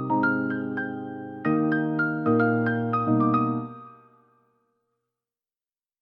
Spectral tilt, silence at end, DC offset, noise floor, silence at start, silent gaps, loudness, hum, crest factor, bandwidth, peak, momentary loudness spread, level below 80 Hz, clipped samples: -11 dB/octave; 2.1 s; under 0.1%; under -90 dBFS; 0 s; none; -25 LUFS; none; 16 dB; 5.2 kHz; -12 dBFS; 11 LU; -66 dBFS; under 0.1%